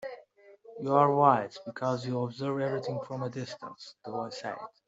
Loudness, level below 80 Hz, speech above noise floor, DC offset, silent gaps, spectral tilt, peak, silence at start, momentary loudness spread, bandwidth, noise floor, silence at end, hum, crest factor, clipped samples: -30 LUFS; -76 dBFS; 26 dB; under 0.1%; none; -7 dB/octave; -8 dBFS; 0 s; 20 LU; 8 kHz; -56 dBFS; 0.2 s; none; 24 dB; under 0.1%